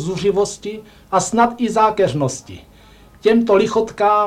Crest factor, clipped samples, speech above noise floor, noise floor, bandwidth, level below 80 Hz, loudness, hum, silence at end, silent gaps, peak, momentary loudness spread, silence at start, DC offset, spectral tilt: 14 dB; under 0.1%; 29 dB; -45 dBFS; 13.5 kHz; -48 dBFS; -17 LUFS; none; 0 s; none; -2 dBFS; 13 LU; 0 s; under 0.1%; -5 dB/octave